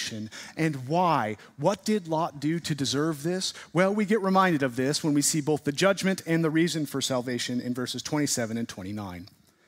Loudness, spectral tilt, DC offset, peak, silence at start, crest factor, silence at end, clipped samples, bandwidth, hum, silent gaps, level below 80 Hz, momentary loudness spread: -27 LUFS; -4.5 dB/octave; under 0.1%; -8 dBFS; 0 s; 20 dB; 0.4 s; under 0.1%; 16 kHz; none; none; -68 dBFS; 10 LU